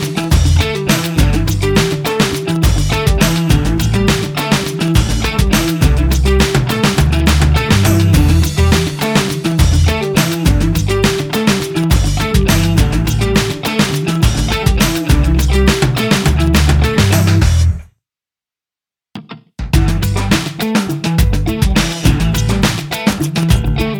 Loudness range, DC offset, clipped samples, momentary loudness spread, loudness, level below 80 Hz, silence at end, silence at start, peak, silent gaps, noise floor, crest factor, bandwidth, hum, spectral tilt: 4 LU; under 0.1%; under 0.1%; 4 LU; -13 LUFS; -18 dBFS; 0 s; 0 s; 0 dBFS; none; -89 dBFS; 12 dB; 19.5 kHz; none; -5 dB/octave